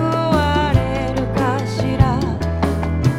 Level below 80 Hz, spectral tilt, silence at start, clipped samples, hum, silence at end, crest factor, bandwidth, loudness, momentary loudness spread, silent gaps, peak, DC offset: -28 dBFS; -7 dB/octave; 0 s; under 0.1%; none; 0 s; 16 dB; 14.5 kHz; -18 LUFS; 4 LU; none; 0 dBFS; under 0.1%